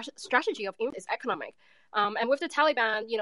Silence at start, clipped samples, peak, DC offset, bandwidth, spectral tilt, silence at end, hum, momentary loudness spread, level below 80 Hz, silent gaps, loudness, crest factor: 0 s; under 0.1%; -8 dBFS; under 0.1%; 11.5 kHz; -3 dB/octave; 0 s; none; 9 LU; -82 dBFS; none; -29 LUFS; 20 dB